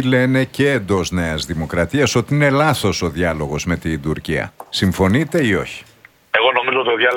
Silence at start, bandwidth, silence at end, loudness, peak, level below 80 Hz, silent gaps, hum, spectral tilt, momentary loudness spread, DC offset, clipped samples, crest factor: 0 s; 18 kHz; 0 s; -17 LUFS; 0 dBFS; -38 dBFS; none; none; -5 dB/octave; 7 LU; under 0.1%; under 0.1%; 16 dB